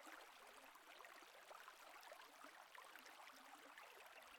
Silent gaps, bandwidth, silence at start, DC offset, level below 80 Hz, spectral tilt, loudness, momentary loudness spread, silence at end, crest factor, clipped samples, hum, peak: none; 19 kHz; 0 s; under 0.1%; under -90 dBFS; 0 dB/octave; -61 LUFS; 2 LU; 0 s; 18 dB; under 0.1%; none; -44 dBFS